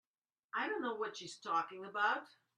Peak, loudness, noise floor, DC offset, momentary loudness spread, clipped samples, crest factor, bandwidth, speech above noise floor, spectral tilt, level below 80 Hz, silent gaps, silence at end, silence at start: -22 dBFS; -39 LUFS; under -90 dBFS; under 0.1%; 8 LU; under 0.1%; 18 dB; 10.5 kHz; over 51 dB; -3 dB/octave; under -90 dBFS; none; 0.3 s; 0.55 s